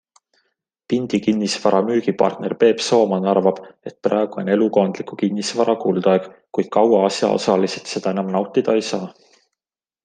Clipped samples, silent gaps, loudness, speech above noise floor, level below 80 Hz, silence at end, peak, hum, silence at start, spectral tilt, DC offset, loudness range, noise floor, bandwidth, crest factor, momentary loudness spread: under 0.1%; none; -19 LUFS; over 72 dB; -66 dBFS; 0.95 s; -2 dBFS; none; 0.9 s; -5.5 dB/octave; under 0.1%; 1 LU; under -90 dBFS; 9.8 kHz; 18 dB; 8 LU